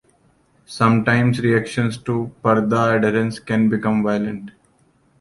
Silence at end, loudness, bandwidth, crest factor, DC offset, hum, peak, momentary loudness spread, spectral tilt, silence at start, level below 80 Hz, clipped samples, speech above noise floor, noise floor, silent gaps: 0.7 s; -19 LUFS; 11.5 kHz; 18 dB; under 0.1%; none; -2 dBFS; 8 LU; -7 dB/octave; 0.7 s; -54 dBFS; under 0.1%; 40 dB; -59 dBFS; none